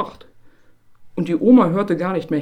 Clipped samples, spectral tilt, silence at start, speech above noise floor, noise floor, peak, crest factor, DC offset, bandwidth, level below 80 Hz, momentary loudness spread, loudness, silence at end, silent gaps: under 0.1%; -9 dB/octave; 0 s; 32 dB; -49 dBFS; -2 dBFS; 18 dB; under 0.1%; 8.8 kHz; -56 dBFS; 16 LU; -17 LUFS; 0 s; none